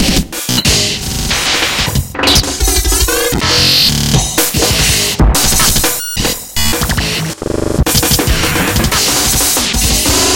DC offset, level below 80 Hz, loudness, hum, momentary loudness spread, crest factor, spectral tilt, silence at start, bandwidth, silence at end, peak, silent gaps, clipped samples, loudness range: under 0.1%; -20 dBFS; -11 LUFS; none; 6 LU; 12 dB; -2.5 dB/octave; 0 s; 17.5 kHz; 0 s; 0 dBFS; none; under 0.1%; 2 LU